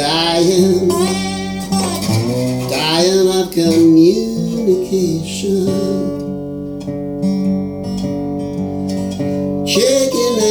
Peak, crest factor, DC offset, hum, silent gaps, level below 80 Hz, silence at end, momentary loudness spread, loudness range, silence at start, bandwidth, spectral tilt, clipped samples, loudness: 0 dBFS; 14 dB; under 0.1%; none; none; -44 dBFS; 0 s; 10 LU; 7 LU; 0 s; over 20 kHz; -5 dB/octave; under 0.1%; -15 LUFS